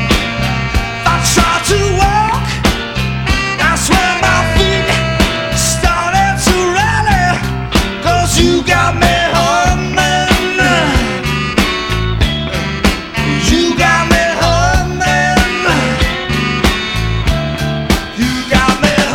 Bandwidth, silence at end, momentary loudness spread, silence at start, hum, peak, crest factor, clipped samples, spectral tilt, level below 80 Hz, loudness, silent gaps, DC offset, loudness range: 18.5 kHz; 0 s; 5 LU; 0 s; none; 0 dBFS; 12 dB; under 0.1%; -4 dB/octave; -22 dBFS; -12 LUFS; none; under 0.1%; 2 LU